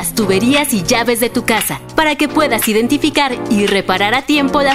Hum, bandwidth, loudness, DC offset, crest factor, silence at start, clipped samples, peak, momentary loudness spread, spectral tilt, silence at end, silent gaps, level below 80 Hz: none; 16 kHz; -13 LUFS; under 0.1%; 14 dB; 0 s; under 0.1%; 0 dBFS; 3 LU; -3.5 dB/octave; 0 s; none; -40 dBFS